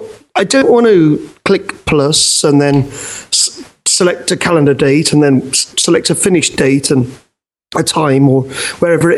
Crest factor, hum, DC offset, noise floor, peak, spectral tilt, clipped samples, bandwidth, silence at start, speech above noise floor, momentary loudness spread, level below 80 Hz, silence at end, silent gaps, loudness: 12 dB; none; under 0.1%; -38 dBFS; 0 dBFS; -4 dB/octave; under 0.1%; 12.5 kHz; 0 s; 28 dB; 8 LU; -44 dBFS; 0 s; none; -11 LUFS